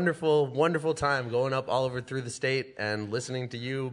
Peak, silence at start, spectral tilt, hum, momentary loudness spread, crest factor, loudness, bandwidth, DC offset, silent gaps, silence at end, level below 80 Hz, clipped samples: -12 dBFS; 0 s; -5.5 dB/octave; none; 8 LU; 18 dB; -29 LUFS; 11 kHz; under 0.1%; none; 0 s; -62 dBFS; under 0.1%